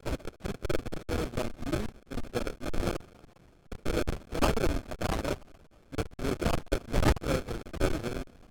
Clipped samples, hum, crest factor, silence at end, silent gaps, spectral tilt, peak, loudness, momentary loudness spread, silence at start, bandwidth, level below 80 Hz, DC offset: under 0.1%; none; 20 dB; 0.05 s; none; -5.5 dB/octave; -12 dBFS; -33 LUFS; 11 LU; 0 s; 19 kHz; -36 dBFS; under 0.1%